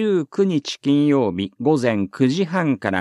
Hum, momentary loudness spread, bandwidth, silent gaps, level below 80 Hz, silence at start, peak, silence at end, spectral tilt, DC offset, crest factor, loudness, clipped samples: none; 5 LU; 11 kHz; none; -64 dBFS; 0 s; -2 dBFS; 0 s; -6.5 dB/octave; under 0.1%; 16 dB; -20 LUFS; under 0.1%